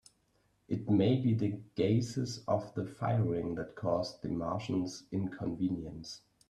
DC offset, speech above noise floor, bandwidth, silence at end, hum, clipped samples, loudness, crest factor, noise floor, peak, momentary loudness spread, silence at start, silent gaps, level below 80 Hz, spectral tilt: under 0.1%; 40 dB; 11 kHz; 0.3 s; none; under 0.1%; -34 LUFS; 16 dB; -73 dBFS; -16 dBFS; 10 LU; 0.7 s; none; -64 dBFS; -7.5 dB/octave